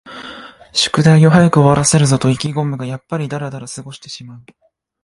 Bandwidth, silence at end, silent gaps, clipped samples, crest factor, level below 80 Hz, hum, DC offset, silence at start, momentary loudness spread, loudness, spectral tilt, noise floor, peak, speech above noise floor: 11.5 kHz; 0.65 s; none; under 0.1%; 14 dB; -46 dBFS; none; under 0.1%; 0.05 s; 21 LU; -13 LUFS; -5.5 dB/octave; -35 dBFS; 0 dBFS; 21 dB